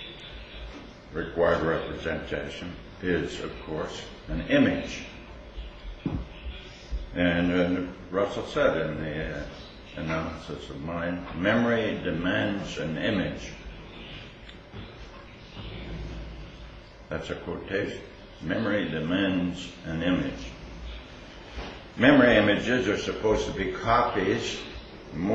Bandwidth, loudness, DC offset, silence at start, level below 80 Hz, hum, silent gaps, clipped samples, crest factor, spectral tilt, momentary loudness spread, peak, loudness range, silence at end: 8.2 kHz; -27 LUFS; under 0.1%; 0 s; -44 dBFS; none; none; under 0.1%; 22 dB; -6 dB/octave; 20 LU; -8 dBFS; 12 LU; 0 s